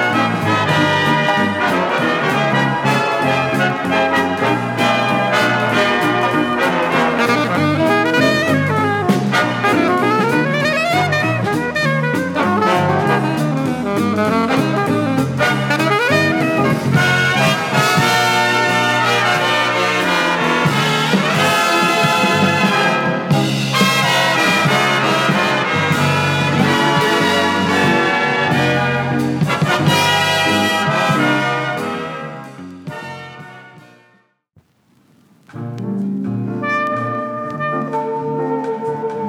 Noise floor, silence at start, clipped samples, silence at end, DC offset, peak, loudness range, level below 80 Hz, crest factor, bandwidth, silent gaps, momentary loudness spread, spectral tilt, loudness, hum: -56 dBFS; 0 s; under 0.1%; 0 s; under 0.1%; 0 dBFS; 8 LU; -56 dBFS; 16 dB; 18 kHz; none; 8 LU; -5 dB/octave; -15 LUFS; none